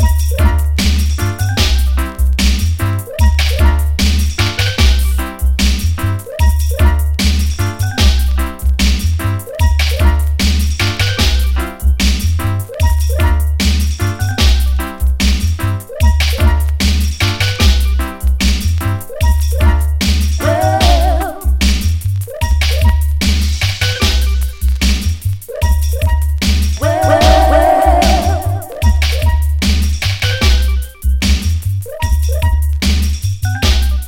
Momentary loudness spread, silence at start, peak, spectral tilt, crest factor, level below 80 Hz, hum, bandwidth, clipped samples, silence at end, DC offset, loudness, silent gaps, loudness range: 6 LU; 0 s; 0 dBFS; -5 dB/octave; 12 dB; -14 dBFS; none; 17 kHz; under 0.1%; 0 s; under 0.1%; -14 LUFS; none; 3 LU